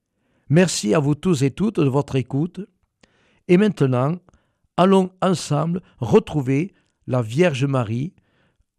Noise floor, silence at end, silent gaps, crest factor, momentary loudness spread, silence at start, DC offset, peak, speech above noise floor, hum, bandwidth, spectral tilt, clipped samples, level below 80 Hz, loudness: -64 dBFS; 0.7 s; none; 16 dB; 13 LU; 0.5 s; under 0.1%; -4 dBFS; 45 dB; none; 13.5 kHz; -6.5 dB/octave; under 0.1%; -54 dBFS; -20 LUFS